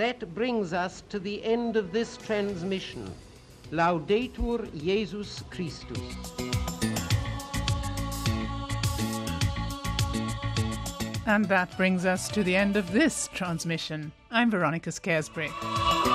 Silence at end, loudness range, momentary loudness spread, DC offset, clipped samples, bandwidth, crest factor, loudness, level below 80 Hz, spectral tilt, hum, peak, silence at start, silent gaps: 0 s; 5 LU; 11 LU; under 0.1%; under 0.1%; 15.5 kHz; 18 dB; -29 LUFS; -42 dBFS; -5 dB/octave; none; -10 dBFS; 0 s; none